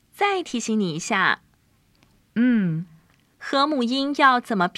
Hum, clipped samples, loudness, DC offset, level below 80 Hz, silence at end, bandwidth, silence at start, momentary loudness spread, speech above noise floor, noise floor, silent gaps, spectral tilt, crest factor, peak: none; under 0.1%; -22 LUFS; under 0.1%; -68 dBFS; 0.1 s; 13 kHz; 0.2 s; 12 LU; 40 dB; -62 dBFS; none; -4.5 dB/octave; 20 dB; -4 dBFS